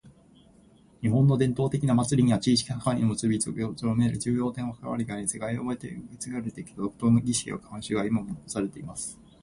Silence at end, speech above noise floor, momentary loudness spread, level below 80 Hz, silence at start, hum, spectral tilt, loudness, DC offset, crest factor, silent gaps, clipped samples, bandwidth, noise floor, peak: 0.3 s; 30 dB; 13 LU; -54 dBFS; 0.05 s; none; -6 dB/octave; -27 LUFS; under 0.1%; 18 dB; none; under 0.1%; 11.5 kHz; -57 dBFS; -10 dBFS